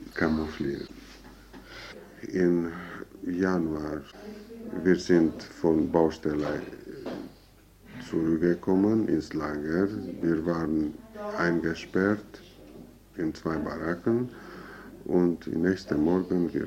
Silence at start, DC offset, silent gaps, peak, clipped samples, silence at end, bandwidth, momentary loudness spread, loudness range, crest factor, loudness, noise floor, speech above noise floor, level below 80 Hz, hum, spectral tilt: 0 s; under 0.1%; none; -10 dBFS; under 0.1%; 0 s; 15.5 kHz; 20 LU; 4 LU; 18 dB; -28 LUFS; -55 dBFS; 28 dB; -52 dBFS; none; -7.5 dB/octave